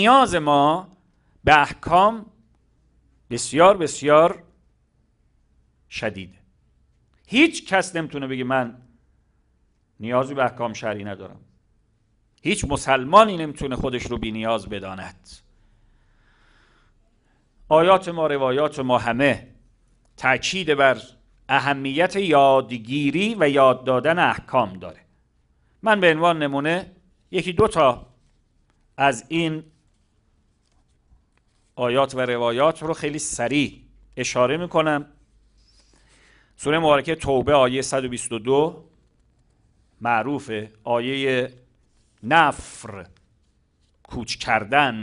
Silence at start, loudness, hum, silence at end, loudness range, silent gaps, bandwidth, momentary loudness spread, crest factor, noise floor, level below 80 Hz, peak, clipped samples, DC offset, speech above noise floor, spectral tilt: 0 s; -21 LUFS; none; 0 s; 8 LU; none; 11 kHz; 15 LU; 22 dB; -64 dBFS; -48 dBFS; 0 dBFS; under 0.1%; under 0.1%; 44 dB; -4.5 dB/octave